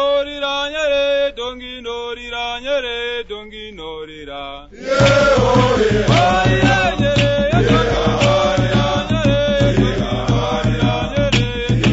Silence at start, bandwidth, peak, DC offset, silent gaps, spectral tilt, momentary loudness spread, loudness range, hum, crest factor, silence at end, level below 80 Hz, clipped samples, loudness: 0 s; 8 kHz; 0 dBFS; under 0.1%; none; -5.5 dB/octave; 16 LU; 9 LU; none; 16 dB; 0 s; -30 dBFS; under 0.1%; -16 LUFS